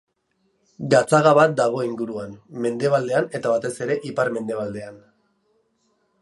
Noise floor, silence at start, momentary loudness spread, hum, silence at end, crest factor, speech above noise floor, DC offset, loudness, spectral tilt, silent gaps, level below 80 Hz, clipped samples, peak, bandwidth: -69 dBFS; 0.8 s; 17 LU; none; 1.25 s; 20 dB; 48 dB; under 0.1%; -21 LUFS; -5.5 dB/octave; none; -66 dBFS; under 0.1%; -2 dBFS; 11.5 kHz